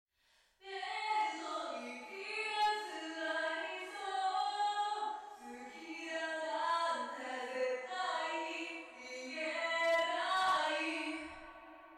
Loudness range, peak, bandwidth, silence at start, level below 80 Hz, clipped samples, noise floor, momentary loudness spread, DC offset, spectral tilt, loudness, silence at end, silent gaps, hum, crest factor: 3 LU; -26 dBFS; 14.5 kHz; 0.6 s; -78 dBFS; under 0.1%; -73 dBFS; 14 LU; under 0.1%; -1 dB/octave; -38 LUFS; 0 s; none; none; 12 dB